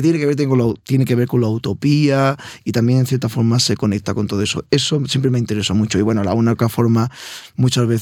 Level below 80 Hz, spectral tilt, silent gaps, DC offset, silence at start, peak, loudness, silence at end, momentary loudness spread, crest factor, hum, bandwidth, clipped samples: -52 dBFS; -6 dB/octave; none; under 0.1%; 0 s; -2 dBFS; -17 LUFS; 0 s; 5 LU; 16 dB; none; 16.5 kHz; under 0.1%